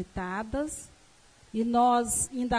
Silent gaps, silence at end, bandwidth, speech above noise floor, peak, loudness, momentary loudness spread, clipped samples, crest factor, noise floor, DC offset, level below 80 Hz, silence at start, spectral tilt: none; 0 s; 11 kHz; 30 dB; -16 dBFS; -28 LUFS; 13 LU; under 0.1%; 14 dB; -58 dBFS; under 0.1%; -50 dBFS; 0 s; -4 dB/octave